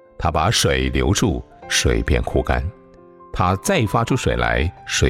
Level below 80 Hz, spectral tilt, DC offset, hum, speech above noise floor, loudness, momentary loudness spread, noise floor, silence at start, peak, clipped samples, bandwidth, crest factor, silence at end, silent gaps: -28 dBFS; -4.5 dB/octave; under 0.1%; none; 26 dB; -19 LUFS; 6 LU; -45 dBFS; 0.2 s; -4 dBFS; under 0.1%; 16.5 kHz; 16 dB; 0 s; none